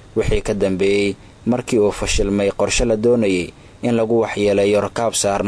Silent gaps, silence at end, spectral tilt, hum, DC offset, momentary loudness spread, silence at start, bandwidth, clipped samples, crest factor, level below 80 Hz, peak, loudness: none; 0 s; -4.5 dB/octave; none; under 0.1%; 6 LU; 0.15 s; 11 kHz; under 0.1%; 12 dB; -32 dBFS; -6 dBFS; -18 LUFS